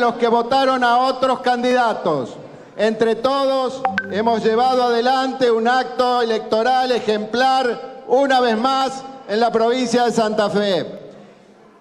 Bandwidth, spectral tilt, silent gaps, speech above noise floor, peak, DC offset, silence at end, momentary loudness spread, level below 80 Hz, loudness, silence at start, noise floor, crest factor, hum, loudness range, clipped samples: 12 kHz; -4.5 dB/octave; none; 30 dB; -4 dBFS; under 0.1%; 0.55 s; 7 LU; -60 dBFS; -18 LUFS; 0 s; -47 dBFS; 14 dB; none; 2 LU; under 0.1%